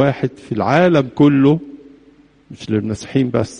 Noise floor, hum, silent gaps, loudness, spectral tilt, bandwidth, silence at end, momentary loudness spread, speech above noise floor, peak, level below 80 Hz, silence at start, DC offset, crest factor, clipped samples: -49 dBFS; none; none; -16 LUFS; -7.5 dB/octave; 10 kHz; 0 s; 10 LU; 34 dB; -2 dBFS; -50 dBFS; 0 s; under 0.1%; 16 dB; under 0.1%